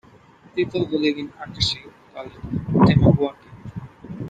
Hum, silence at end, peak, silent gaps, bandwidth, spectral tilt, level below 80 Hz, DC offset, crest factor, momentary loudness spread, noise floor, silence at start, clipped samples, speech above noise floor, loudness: none; 0 s; -2 dBFS; none; 9.2 kHz; -7 dB/octave; -42 dBFS; under 0.1%; 20 dB; 22 LU; -50 dBFS; 0.55 s; under 0.1%; 30 dB; -21 LUFS